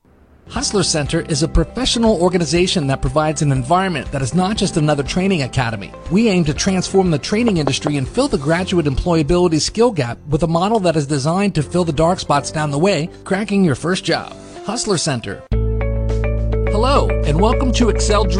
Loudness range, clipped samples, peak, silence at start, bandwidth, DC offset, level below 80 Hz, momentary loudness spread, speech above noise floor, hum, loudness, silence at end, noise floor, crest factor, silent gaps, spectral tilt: 2 LU; under 0.1%; 0 dBFS; 0.45 s; 11 kHz; under 0.1%; -26 dBFS; 6 LU; 29 dB; none; -17 LUFS; 0 s; -46 dBFS; 16 dB; none; -5 dB/octave